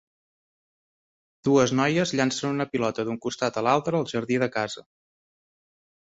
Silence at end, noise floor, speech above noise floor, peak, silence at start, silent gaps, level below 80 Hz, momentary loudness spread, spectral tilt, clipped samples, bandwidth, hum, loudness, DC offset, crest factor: 1.25 s; under -90 dBFS; over 66 dB; -8 dBFS; 1.45 s; none; -64 dBFS; 9 LU; -5 dB/octave; under 0.1%; 8 kHz; none; -25 LUFS; under 0.1%; 20 dB